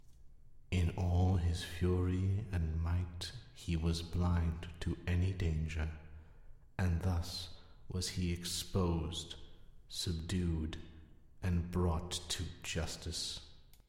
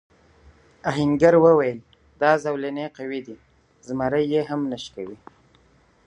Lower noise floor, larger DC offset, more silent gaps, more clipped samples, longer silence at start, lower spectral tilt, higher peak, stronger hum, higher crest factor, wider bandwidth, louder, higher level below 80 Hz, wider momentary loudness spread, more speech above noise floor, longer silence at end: about the same, -57 dBFS vs -58 dBFS; neither; neither; neither; second, 0.05 s vs 0.85 s; second, -5.5 dB/octave vs -7 dB/octave; second, -22 dBFS vs -4 dBFS; neither; about the same, 16 dB vs 20 dB; first, 15.5 kHz vs 8.6 kHz; second, -38 LUFS vs -22 LUFS; first, -46 dBFS vs -56 dBFS; second, 11 LU vs 19 LU; second, 20 dB vs 37 dB; second, 0.25 s vs 0.9 s